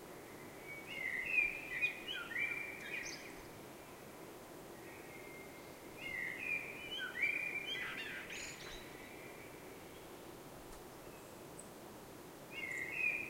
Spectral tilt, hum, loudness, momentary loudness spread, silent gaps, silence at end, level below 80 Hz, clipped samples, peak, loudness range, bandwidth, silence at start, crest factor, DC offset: -2.5 dB/octave; none; -41 LUFS; 17 LU; none; 0 s; -68 dBFS; under 0.1%; -24 dBFS; 13 LU; 16 kHz; 0 s; 22 dB; under 0.1%